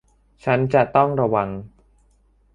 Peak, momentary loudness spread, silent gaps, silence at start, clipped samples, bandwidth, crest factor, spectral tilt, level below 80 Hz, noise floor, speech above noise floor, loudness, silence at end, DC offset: -2 dBFS; 12 LU; none; 0.45 s; under 0.1%; 9.6 kHz; 20 dB; -9 dB/octave; -52 dBFS; -59 dBFS; 40 dB; -20 LUFS; 0.9 s; under 0.1%